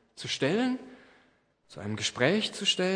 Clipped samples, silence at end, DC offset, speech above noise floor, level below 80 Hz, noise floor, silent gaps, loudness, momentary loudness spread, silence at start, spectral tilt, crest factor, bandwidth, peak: under 0.1%; 0 s; under 0.1%; 38 dB; -72 dBFS; -66 dBFS; none; -29 LUFS; 12 LU; 0.15 s; -3.5 dB/octave; 22 dB; 10.5 kHz; -8 dBFS